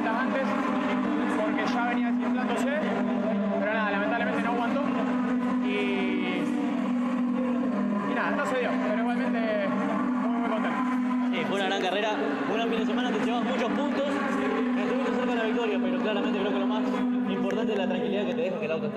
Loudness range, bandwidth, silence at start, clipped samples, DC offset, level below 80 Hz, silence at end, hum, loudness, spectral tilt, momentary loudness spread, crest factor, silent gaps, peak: 0 LU; 9.6 kHz; 0 s; under 0.1%; under 0.1%; -68 dBFS; 0 s; none; -27 LUFS; -6 dB/octave; 1 LU; 12 dB; none; -14 dBFS